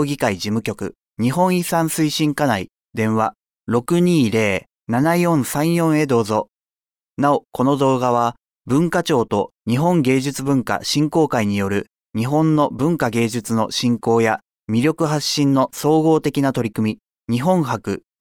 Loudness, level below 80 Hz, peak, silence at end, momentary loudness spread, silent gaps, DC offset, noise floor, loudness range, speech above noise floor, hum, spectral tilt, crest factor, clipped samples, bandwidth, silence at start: -19 LUFS; -56 dBFS; -4 dBFS; 0.2 s; 8 LU; none; under 0.1%; under -90 dBFS; 1 LU; over 72 dB; none; -5.5 dB/octave; 14 dB; under 0.1%; 19 kHz; 0 s